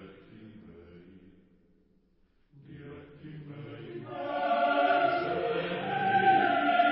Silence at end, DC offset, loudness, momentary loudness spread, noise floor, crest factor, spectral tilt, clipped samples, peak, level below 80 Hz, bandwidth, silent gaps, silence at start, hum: 0 s; under 0.1%; -27 LUFS; 23 LU; -67 dBFS; 18 dB; -9 dB/octave; under 0.1%; -12 dBFS; -66 dBFS; 5.8 kHz; none; 0 s; none